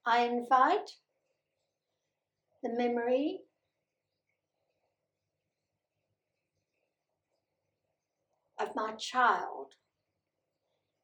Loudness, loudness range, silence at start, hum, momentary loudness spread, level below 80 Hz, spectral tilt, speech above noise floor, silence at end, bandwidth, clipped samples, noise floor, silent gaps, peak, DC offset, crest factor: -31 LUFS; 11 LU; 0.05 s; none; 16 LU; under -90 dBFS; -3 dB/octave; 56 dB; 1.4 s; 18 kHz; under 0.1%; -87 dBFS; none; -14 dBFS; under 0.1%; 22 dB